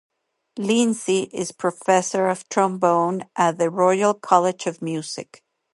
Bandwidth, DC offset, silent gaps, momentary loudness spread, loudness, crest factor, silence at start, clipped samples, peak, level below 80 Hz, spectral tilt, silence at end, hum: 11.5 kHz; under 0.1%; none; 10 LU; -21 LUFS; 20 dB; 0.55 s; under 0.1%; 0 dBFS; -74 dBFS; -4.5 dB/octave; 0.55 s; none